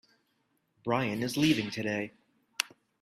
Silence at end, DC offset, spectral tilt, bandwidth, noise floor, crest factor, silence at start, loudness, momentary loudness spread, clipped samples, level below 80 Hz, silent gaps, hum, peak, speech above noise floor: 0.35 s; under 0.1%; -4.5 dB/octave; 15.5 kHz; -75 dBFS; 26 dB; 0.85 s; -31 LUFS; 14 LU; under 0.1%; -68 dBFS; none; none; -8 dBFS; 45 dB